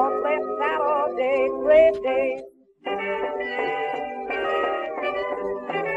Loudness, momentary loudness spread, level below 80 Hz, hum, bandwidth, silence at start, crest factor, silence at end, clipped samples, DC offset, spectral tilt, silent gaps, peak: -23 LUFS; 11 LU; -58 dBFS; none; 7.8 kHz; 0 s; 18 dB; 0 s; under 0.1%; under 0.1%; -5.5 dB/octave; none; -6 dBFS